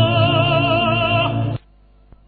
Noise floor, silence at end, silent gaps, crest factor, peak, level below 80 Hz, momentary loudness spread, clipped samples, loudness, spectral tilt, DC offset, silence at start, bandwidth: -50 dBFS; 0.7 s; none; 14 dB; -4 dBFS; -40 dBFS; 9 LU; under 0.1%; -17 LUFS; -9.5 dB/octave; under 0.1%; 0 s; 4.8 kHz